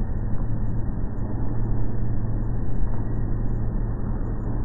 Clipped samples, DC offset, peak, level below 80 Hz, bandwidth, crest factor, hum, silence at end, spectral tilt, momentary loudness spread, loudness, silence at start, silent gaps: under 0.1%; under 0.1%; -8 dBFS; -26 dBFS; 2 kHz; 14 dB; none; 0 s; -14 dB/octave; 2 LU; -29 LUFS; 0 s; none